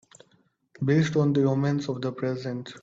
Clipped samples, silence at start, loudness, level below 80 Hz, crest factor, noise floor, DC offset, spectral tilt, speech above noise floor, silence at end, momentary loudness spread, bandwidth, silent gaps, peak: under 0.1%; 0.8 s; -26 LUFS; -64 dBFS; 16 dB; -66 dBFS; under 0.1%; -7.5 dB/octave; 41 dB; 0.05 s; 9 LU; 7.8 kHz; none; -12 dBFS